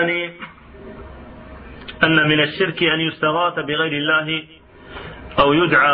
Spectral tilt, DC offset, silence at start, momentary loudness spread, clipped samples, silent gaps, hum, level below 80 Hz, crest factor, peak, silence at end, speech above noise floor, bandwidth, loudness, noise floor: -10 dB/octave; under 0.1%; 0 s; 24 LU; under 0.1%; none; none; -46 dBFS; 18 dB; -2 dBFS; 0 s; 21 dB; 5.2 kHz; -17 LUFS; -39 dBFS